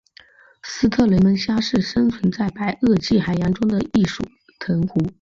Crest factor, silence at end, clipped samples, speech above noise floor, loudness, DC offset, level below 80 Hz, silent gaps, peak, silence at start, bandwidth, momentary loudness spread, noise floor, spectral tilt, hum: 14 dB; 0.1 s; under 0.1%; 31 dB; -19 LUFS; under 0.1%; -44 dBFS; none; -4 dBFS; 0.65 s; 7.6 kHz; 11 LU; -50 dBFS; -6.5 dB/octave; none